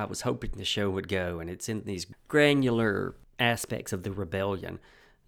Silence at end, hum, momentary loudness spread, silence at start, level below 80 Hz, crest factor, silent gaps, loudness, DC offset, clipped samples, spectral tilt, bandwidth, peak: 0.5 s; none; 14 LU; 0 s; -50 dBFS; 20 dB; none; -29 LUFS; under 0.1%; under 0.1%; -4.5 dB/octave; 19.5 kHz; -10 dBFS